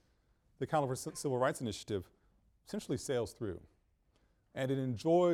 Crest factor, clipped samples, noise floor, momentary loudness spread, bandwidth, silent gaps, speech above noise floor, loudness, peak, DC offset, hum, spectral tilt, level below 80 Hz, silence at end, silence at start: 18 dB; under 0.1%; -73 dBFS; 11 LU; 16 kHz; none; 38 dB; -37 LUFS; -18 dBFS; under 0.1%; none; -6 dB/octave; -66 dBFS; 0 s; 0.6 s